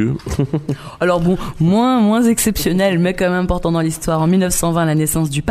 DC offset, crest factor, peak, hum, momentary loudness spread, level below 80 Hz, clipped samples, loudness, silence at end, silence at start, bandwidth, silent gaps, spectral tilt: under 0.1%; 12 dB; -2 dBFS; none; 6 LU; -34 dBFS; under 0.1%; -16 LUFS; 0 s; 0 s; 15.5 kHz; none; -5.5 dB/octave